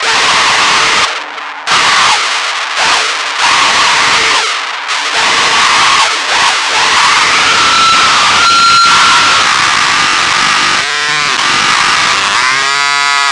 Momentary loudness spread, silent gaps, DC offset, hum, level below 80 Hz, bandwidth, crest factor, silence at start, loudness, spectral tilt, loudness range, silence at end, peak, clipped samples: 6 LU; none; under 0.1%; none; -46 dBFS; 11.5 kHz; 10 dB; 0 s; -7 LUFS; 0.5 dB/octave; 3 LU; 0 s; 0 dBFS; under 0.1%